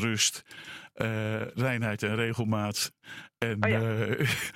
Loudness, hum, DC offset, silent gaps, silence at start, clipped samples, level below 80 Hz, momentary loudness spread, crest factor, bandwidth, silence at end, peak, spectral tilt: -29 LUFS; none; under 0.1%; none; 0 s; under 0.1%; -64 dBFS; 16 LU; 24 dB; 16.5 kHz; 0.05 s; -6 dBFS; -4 dB/octave